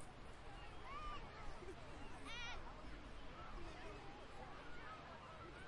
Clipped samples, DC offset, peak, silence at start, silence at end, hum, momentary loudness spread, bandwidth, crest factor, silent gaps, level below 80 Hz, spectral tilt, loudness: under 0.1%; under 0.1%; -38 dBFS; 0 s; 0 s; none; 6 LU; 11 kHz; 14 dB; none; -58 dBFS; -4.5 dB/octave; -55 LUFS